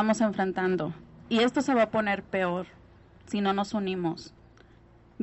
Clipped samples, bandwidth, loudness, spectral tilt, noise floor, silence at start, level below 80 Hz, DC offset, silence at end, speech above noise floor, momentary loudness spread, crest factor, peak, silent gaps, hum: under 0.1%; 8.2 kHz; -28 LUFS; -5.5 dB/octave; -56 dBFS; 0 s; -60 dBFS; under 0.1%; 0 s; 29 dB; 12 LU; 18 dB; -10 dBFS; none; none